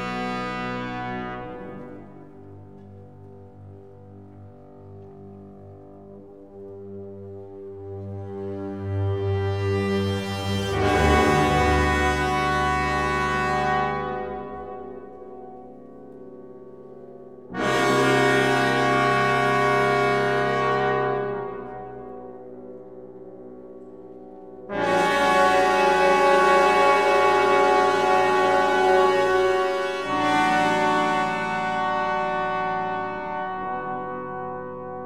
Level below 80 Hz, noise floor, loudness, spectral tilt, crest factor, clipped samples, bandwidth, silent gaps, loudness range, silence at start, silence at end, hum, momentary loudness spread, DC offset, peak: -42 dBFS; -45 dBFS; -22 LUFS; -5 dB/octave; 18 dB; under 0.1%; 15 kHz; none; 20 LU; 0 s; 0 s; none; 24 LU; 0.3%; -6 dBFS